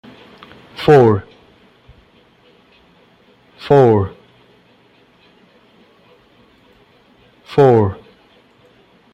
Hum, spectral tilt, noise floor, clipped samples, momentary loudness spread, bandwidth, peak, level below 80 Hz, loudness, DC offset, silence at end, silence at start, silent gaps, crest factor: none; -8.5 dB/octave; -52 dBFS; under 0.1%; 22 LU; 8.2 kHz; 0 dBFS; -54 dBFS; -13 LUFS; under 0.1%; 1.2 s; 0.8 s; none; 18 dB